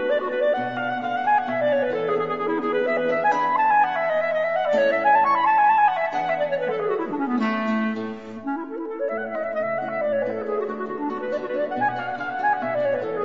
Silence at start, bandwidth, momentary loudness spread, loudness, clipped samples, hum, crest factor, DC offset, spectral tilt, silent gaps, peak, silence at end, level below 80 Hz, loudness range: 0 s; 7.4 kHz; 10 LU; -23 LUFS; under 0.1%; none; 14 dB; 0.3%; -6.5 dB/octave; none; -8 dBFS; 0 s; -70 dBFS; 7 LU